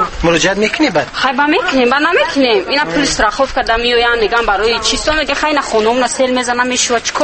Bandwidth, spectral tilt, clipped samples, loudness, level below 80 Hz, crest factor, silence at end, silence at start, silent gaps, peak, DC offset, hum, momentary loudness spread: 8.8 kHz; -2.5 dB/octave; under 0.1%; -12 LUFS; -32 dBFS; 12 dB; 0 s; 0 s; none; 0 dBFS; under 0.1%; none; 3 LU